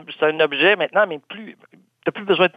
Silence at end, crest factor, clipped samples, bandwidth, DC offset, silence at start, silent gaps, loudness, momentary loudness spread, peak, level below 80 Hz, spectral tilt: 0.05 s; 18 dB; under 0.1%; 5 kHz; under 0.1%; 0.1 s; none; -19 LUFS; 18 LU; -4 dBFS; -66 dBFS; -6.5 dB/octave